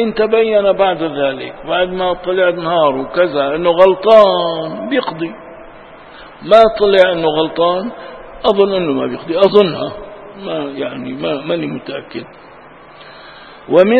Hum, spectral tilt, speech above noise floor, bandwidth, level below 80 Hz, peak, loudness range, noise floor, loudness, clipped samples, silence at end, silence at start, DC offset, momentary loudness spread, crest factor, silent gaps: none; -7 dB/octave; 25 dB; 6.8 kHz; -46 dBFS; 0 dBFS; 9 LU; -39 dBFS; -14 LUFS; 0.2%; 0 s; 0 s; 0.2%; 17 LU; 14 dB; none